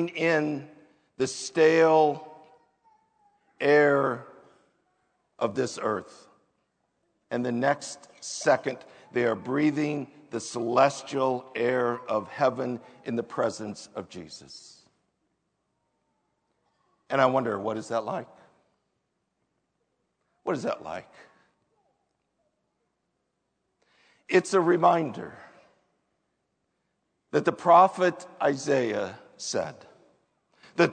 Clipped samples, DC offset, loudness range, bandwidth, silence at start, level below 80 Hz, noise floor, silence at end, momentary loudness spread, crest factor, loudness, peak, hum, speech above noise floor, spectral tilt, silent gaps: under 0.1%; under 0.1%; 13 LU; 9.4 kHz; 0 s; -78 dBFS; -78 dBFS; 0 s; 17 LU; 22 dB; -26 LUFS; -6 dBFS; none; 52 dB; -5 dB/octave; none